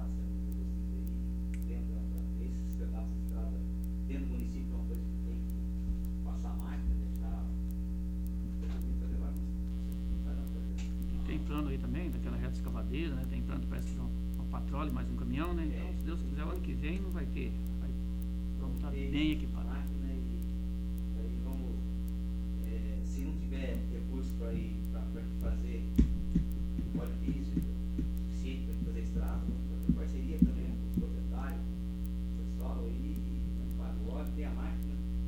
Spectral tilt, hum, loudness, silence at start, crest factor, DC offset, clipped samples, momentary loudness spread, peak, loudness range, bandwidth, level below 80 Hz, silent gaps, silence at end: -8 dB/octave; none; -37 LUFS; 0 s; 22 dB; under 0.1%; under 0.1%; 4 LU; -12 dBFS; 3 LU; 16 kHz; -36 dBFS; none; 0 s